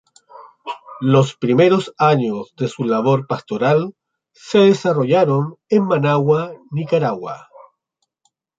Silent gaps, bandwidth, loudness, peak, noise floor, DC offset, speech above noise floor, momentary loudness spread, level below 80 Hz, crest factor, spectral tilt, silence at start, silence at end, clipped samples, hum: none; 8 kHz; -17 LUFS; -2 dBFS; -74 dBFS; under 0.1%; 57 dB; 15 LU; -62 dBFS; 16 dB; -7.5 dB/octave; 0.35 s; 1.2 s; under 0.1%; none